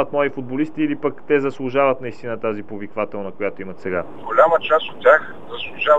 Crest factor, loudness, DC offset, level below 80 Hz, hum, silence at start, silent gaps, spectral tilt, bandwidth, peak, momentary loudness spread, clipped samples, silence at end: 20 dB; -20 LUFS; 2%; -62 dBFS; none; 0 s; none; -7 dB/octave; 7.8 kHz; 0 dBFS; 14 LU; under 0.1%; 0 s